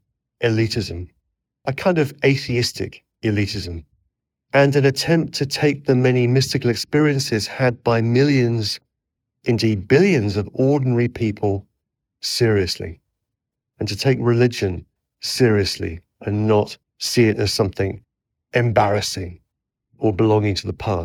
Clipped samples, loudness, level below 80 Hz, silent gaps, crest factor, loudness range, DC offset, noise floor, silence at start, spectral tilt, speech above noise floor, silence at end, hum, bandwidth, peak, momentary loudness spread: under 0.1%; -19 LUFS; -50 dBFS; none; 18 dB; 4 LU; under 0.1%; -82 dBFS; 0.4 s; -5.5 dB/octave; 63 dB; 0 s; none; 17.5 kHz; -2 dBFS; 12 LU